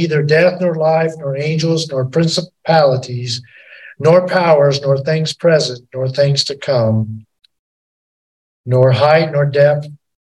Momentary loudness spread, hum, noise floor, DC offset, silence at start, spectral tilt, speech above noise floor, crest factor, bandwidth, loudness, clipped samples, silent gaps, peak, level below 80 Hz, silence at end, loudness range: 10 LU; none; under -90 dBFS; under 0.1%; 0 s; -6 dB/octave; over 76 dB; 14 dB; 11.5 kHz; -14 LUFS; under 0.1%; 7.59-8.64 s; 0 dBFS; -58 dBFS; 0.3 s; 3 LU